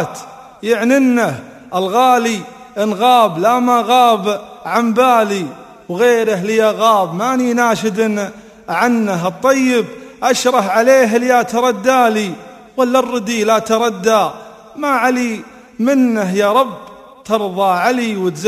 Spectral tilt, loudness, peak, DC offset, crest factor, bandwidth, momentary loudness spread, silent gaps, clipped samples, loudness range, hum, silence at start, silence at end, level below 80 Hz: -4.5 dB/octave; -14 LUFS; 0 dBFS; under 0.1%; 14 dB; 15 kHz; 12 LU; none; under 0.1%; 2 LU; none; 0 s; 0 s; -58 dBFS